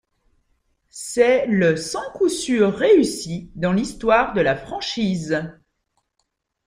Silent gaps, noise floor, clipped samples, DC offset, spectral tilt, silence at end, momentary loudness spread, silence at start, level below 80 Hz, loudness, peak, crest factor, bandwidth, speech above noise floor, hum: none; -74 dBFS; under 0.1%; under 0.1%; -5 dB/octave; 1.15 s; 11 LU; 0.95 s; -50 dBFS; -20 LUFS; -4 dBFS; 18 dB; 15.5 kHz; 54 dB; none